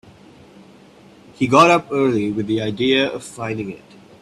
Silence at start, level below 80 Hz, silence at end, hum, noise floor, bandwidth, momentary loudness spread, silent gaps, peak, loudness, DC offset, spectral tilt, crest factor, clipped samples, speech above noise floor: 1.4 s; -56 dBFS; 0.45 s; none; -46 dBFS; 12.5 kHz; 16 LU; none; 0 dBFS; -18 LUFS; under 0.1%; -5 dB/octave; 20 dB; under 0.1%; 29 dB